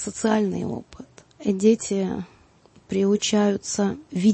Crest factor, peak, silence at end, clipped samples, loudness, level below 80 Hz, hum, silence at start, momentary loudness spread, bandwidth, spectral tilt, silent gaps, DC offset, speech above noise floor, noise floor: 18 dB; -6 dBFS; 0 s; under 0.1%; -23 LUFS; -58 dBFS; none; 0 s; 11 LU; 8.8 kHz; -5 dB/octave; none; under 0.1%; 33 dB; -55 dBFS